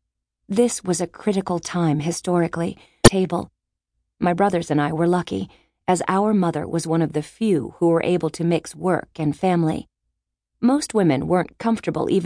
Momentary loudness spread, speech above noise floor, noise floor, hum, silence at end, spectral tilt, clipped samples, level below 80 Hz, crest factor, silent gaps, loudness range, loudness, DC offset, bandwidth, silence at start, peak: 7 LU; 57 dB; -78 dBFS; none; 0 s; -5.5 dB/octave; under 0.1%; -44 dBFS; 22 dB; none; 2 LU; -21 LUFS; under 0.1%; 11 kHz; 0.5 s; 0 dBFS